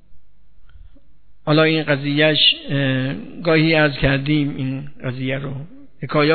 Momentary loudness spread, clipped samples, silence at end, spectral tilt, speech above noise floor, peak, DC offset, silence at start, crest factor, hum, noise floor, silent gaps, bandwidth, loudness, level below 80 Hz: 14 LU; under 0.1%; 0 s; -9 dB/octave; 33 dB; -2 dBFS; 1%; 0.1 s; 18 dB; none; -51 dBFS; none; 4.6 kHz; -18 LUFS; -42 dBFS